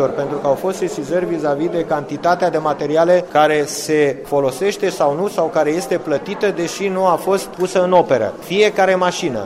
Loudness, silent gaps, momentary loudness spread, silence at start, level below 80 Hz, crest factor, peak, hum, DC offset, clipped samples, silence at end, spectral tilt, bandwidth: -17 LUFS; none; 6 LU; 0 s; -54 dBFS; 14 dB; -2 dBFS; none; under 0.1%; under 0.1%; 0 s; -5 dB/octave; 16 kHz